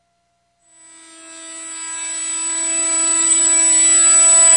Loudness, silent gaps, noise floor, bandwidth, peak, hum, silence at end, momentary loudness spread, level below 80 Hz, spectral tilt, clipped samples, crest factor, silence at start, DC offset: -11 LUFS; none; -65 dBFS; 11.5 kHz; -2 dBFS; none; 0 s; 19 LU; -76 dBFS; 3.5 dB/octave; under 0.1%; 14 dB; 1.25 s; under 0.1%